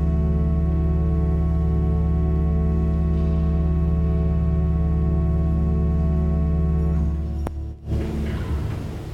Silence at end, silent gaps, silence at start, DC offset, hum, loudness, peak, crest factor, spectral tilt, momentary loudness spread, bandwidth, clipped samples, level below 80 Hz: 0 s; none; 0 s; under 0.1%; none; -22 LUFS; -8 dBFS; 12 dB; -10 dB/octave; 5 LU; 3.8 kHz; under 0.1%; -22 dBFS